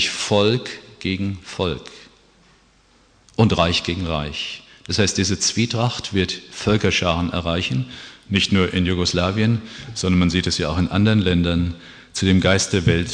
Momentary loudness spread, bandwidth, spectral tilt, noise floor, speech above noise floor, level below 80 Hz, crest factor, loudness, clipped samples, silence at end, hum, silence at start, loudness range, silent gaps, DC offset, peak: 11 LU; 10.5 kHz; -4.5 dB/octave; -55 dBFS; 36 dB; -40 dBFS; 20 dB; -20 LUFS; under 0.1%; 0 s; none; 0 s; 5 LU; none; under 0.1%; -2 dBFS